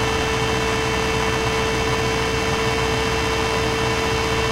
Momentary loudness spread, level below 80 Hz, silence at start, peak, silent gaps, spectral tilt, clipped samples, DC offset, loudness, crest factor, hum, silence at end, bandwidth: 0 LU; -32 dBFS; 0 s; -8 dBFS; none; -4 dB/octave; under 0.1%; under 0.1%; -20 LUFS; 14 dB; none; 0 s; 16 kHz